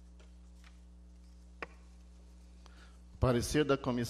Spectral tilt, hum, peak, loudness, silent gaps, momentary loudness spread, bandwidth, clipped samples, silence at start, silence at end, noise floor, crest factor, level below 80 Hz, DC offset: -5.5 dB/octave; 60 Hz at -55 dBFS; -16 dBFS; -32 LUFS; none; 27 LU; 14 kHz; under 0.1%; 0 s; 0 s; -55 dBFS; 22 dB; -50 dBFS; under 0.1%